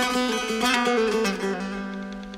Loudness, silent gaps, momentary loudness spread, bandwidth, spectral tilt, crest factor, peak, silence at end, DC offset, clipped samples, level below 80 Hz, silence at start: -24 LUFS; none; 11 LU; 16 kHz; -3.5 dB/octave; 20 dB; -6 dBFS; 0 s; under 0.1%; under 0.1%; -52 dBFS; 0 s